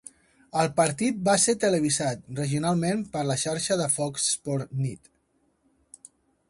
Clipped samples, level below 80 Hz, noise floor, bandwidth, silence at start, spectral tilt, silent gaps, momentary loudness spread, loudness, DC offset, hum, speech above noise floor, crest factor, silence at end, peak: under 0.1%; -62 dBFS; -69 dBFS; 11.5 kHz; 0.55 s; -4 dB/octave; none; 10 LU; -25 LUFS; under 0.1%; none; 44 dB; 18 dB; 1.55 s; -10 dBFS